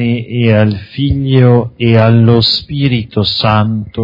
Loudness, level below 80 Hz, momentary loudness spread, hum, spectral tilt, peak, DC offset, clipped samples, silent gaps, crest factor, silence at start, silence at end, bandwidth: -11 LUFS; -36 dBFS; 7 LU; none; -8.5 dB/octave; 0 dBFS; under 0.1%; 0.3%; none; 10 dB; 0 s; 0 s; 5.4 kHz